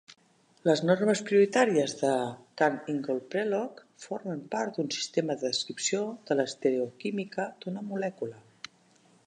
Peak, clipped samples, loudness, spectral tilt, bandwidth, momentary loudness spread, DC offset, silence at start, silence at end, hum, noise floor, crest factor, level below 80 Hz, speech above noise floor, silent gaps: -10 dBFS; under 0.1%; -29 LUFS; -4.5 dB/octave; 11 kHz; 14 LU; under 0.1%; 0.65 s; 0.85 s; none; -63 dBFS; 20 dB; -82 dBFS; 34 dB; none